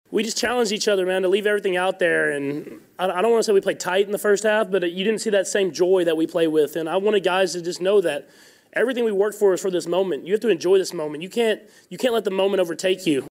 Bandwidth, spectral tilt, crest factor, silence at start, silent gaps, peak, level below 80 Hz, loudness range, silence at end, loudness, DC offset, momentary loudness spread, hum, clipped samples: 16 kHz; -4 dB/octave; 12 dB; 0.1 s; none; -8 dBFS; -70 dBFS; 2 LU; 0 s; -21 LUFS; under 0.1%; 7 LU; none; under 0.1%